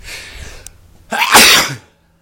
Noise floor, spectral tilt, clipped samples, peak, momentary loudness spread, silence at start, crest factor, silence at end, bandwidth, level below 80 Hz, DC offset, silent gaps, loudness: -39 dBFS; -0.5 dB/octave; 0.8%; 0 dBFS; 24 LU; 0.05 s; 14 dB; 0.45 s; over 20 kHz; -40 dBFS; under 0.1%; none; -7 LUFS